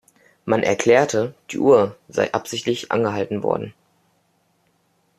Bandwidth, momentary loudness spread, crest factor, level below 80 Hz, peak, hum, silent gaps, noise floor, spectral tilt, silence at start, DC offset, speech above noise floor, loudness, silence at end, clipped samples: 14 kHz; 9 LU; 18 dB; -62 dBFS; -2 dBFS; none; none; -65 dBFS; -5 dB/octave; 0.45 s; under 0.1%; 45 dB; -20 LUFS; 1.45 s; under 0.1%